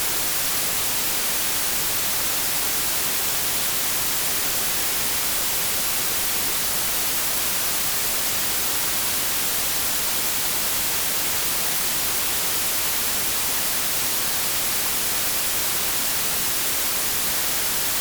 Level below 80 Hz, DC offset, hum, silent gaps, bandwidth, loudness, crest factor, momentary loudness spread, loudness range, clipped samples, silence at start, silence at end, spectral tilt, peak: -48 dBFS; under 0.1%; none; none; over 20 kHz; -20 LUFS; 12 dB; 0 LU; 0 LU; under 0.1%; 0 s; 0 s; 0 dB/octave; -10 dBFS